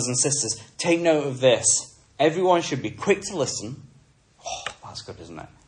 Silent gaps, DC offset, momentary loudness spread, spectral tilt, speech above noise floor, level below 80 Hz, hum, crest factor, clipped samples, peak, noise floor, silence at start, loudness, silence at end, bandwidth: none; under 0.1%; 20 LU; -3 dB/octave; 33 dB; -60 dBFS; none; 18 dB; under 0.1%; -6 dBFS; -57 dBFS; 0 s; -22 LUFS; 0.2 s; 11.5 kHz